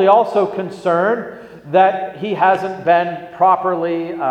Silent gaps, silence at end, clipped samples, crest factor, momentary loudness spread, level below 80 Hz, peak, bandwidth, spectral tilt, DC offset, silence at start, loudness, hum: none; 0 s; under 0.1%; 16 dB; 9 LU; -62 dBFS; 0 dBFS; 9 kHz; -7 dB/octave; under 0.1%; 0 s; -16 LUFS; none